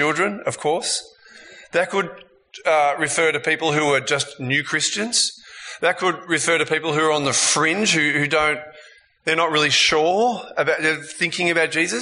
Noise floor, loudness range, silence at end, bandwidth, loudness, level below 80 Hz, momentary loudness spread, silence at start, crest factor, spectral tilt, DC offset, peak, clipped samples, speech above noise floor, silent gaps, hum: -48 dBFS; 3 LU; 0 s; 11 kHz; -19 LUFS; -60 dBFS; 7 LU; 0 s; 18 dB; -2.5 dB/octave; under 0.1%; -4 dBFS; under 0.1%; 28 dB; none; none